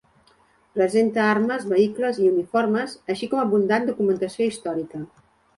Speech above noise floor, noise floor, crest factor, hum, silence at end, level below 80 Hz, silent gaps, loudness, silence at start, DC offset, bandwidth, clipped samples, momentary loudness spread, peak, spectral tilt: 38 dB; -59 dBFS; 16 dB; none; 0.5 s; -66 dBFS; none; -22 LUFS; 0.75 s; under 0.1%; 11.5 kHz; under 0.1%; 9 LU; -6 dBFS; -6 dB/octave